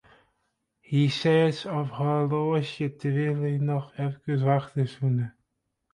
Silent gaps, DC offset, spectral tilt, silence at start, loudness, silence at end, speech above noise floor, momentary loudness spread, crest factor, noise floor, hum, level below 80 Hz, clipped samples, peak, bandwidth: none; under 0.1%; -7.5 dB/octave; 0.9 s; -26 LUFS; 0.65 s; 52 dB; 8 LU; 16 dB; -78 dBFS; none; -66 dBFS; under 0.1%; -12 dBFS; 9.6 kHz